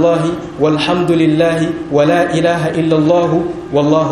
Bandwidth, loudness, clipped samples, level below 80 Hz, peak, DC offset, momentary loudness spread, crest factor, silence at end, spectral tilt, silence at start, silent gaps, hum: 11.5 kHz; -13 LUFS; under 0.1%; -44 dBFS; 0 dBFS; under 0.1%; 5 LU; 12 dB; 0 s; -6.5 dB/octave; 0 s; none; none